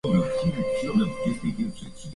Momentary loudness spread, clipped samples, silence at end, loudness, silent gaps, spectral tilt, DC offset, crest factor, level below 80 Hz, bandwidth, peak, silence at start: 8 LU; under 0.1%; 0 s; -26 LUFS; none; -7 dB/octave; under 0.1%; 14 dB; -48 dBFS; 11.5 kHz; -10 dBFS; 0.05 s